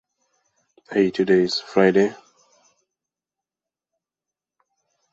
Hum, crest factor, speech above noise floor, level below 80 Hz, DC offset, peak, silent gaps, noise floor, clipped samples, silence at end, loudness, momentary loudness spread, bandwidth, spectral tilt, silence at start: none; 22 dB; 71 dB; -66 dBFS; under 0.1%; -4 dBFS; none; -89 dBFS; under 0.1%; 2.95 s; -20 LUFS; 6 LU; 7.8 kHz; -6 dB/octave; 0.9 s